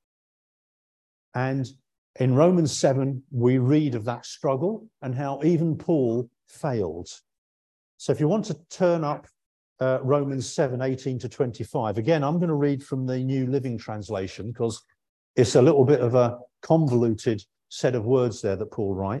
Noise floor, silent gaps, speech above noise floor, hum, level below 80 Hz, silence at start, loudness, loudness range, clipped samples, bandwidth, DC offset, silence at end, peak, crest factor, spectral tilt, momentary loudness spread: under -90 dBFS; 1.98-2.14 s, 7.38-7.98 s, 9.46-9.76 s, 15.09-15.34 s; over 67 dB; none; -56 dBFS; 1.35 s; -24 LUFS; 5 LU; under 0.1%; 11.5 kHz; under 0.1%; 0 s; -6 dBFS; 18 dB; -7 dB/octave; 13 LU